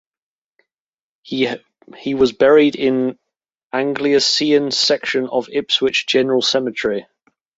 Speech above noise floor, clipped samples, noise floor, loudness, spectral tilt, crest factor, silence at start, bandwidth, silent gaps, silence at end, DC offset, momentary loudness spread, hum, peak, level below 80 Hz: over 73 dB; under 0.1%; under -90 dBFS; -17 LUFS; -3.5 dB/octave; 16 dB; 1.25 s; 8 kHz; 3.63-3.70 s; 0.55 s; under 0.1%; 12 LU; none; -2 dBFS; -58 dBFS